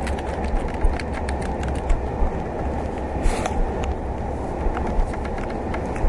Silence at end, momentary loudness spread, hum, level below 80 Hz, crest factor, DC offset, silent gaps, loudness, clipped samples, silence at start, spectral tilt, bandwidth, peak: 0 s; 3 LU; none; -26 dBFS; 18 dB; under 0.1%; none; -26 LUFS; under 0.1%; 0 s; -6.5 dB/octave; 11.5 kHz; -6 dBFS